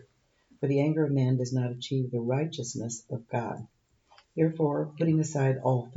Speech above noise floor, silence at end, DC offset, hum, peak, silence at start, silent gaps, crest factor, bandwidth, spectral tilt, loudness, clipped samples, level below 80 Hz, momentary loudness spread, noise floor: 37 dB; 0 s; under 0.1%; none; -12 dBFS; 0.6 s; none; 16 dB; 8 kHz; -7 dB/octave; -29 LUFS; under 0.1%; -70 dBFS; 9 LU; -65 dBFS